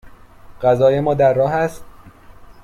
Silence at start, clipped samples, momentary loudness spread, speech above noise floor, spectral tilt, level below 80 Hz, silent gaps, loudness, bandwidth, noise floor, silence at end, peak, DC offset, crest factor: 0.05 s; under 0.1%; 7 LU; 26 dB; -7.5 dB/octave; -46 dBFS; none; -16 LUFS; 14 kHz; -42 dBFS; 0.15 s; -2 dBFS; under 0.1%; 16 dB